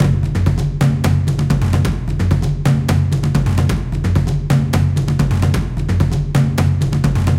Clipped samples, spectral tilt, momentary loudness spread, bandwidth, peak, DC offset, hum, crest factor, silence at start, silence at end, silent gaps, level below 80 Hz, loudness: under 0.1%; -7 dB/octave; 2 LU; 15.5 kHz; -2 dBFS; under 0.1%; none; 14 dB; 0 s; 0 s; none; -24 dBFS; -16 LUFS